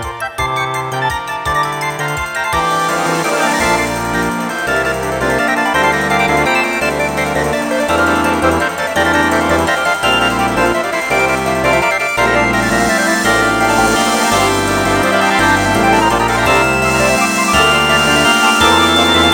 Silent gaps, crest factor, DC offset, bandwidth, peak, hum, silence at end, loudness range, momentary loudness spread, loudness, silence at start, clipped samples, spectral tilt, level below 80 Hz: none; 14 dB; under 0.1%; 18 kHz; 0 dBFS; none; 0 s; 4 LU; 7 LU; -13 LUFS; 0 s; under 0.1%; -3.5 dB/octave; -32 dBFS